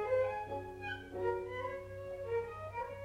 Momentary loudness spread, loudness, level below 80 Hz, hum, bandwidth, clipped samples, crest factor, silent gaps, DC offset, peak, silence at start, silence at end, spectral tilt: 8 LU; -40 LUFS; -60 dBFS; none; 13.5 kHz; under 0.1%; 16 dB; none; under 0.1%; -24 dBFS; 0 s; 0 s; -6.5 dB/octave